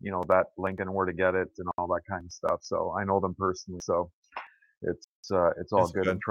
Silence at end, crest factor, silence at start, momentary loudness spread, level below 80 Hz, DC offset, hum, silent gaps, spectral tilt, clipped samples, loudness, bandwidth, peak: 0 s; 22 dB; 0.05 s; 11 LU; -60 dBFS; under 0.1%; none; 4.13-4.22 s, 4.77-4.81 s, 5.04-5.23 s; -6 dB/octave; under 0.1%; -29 LUFS; 11.5 kHz; -8 dBFS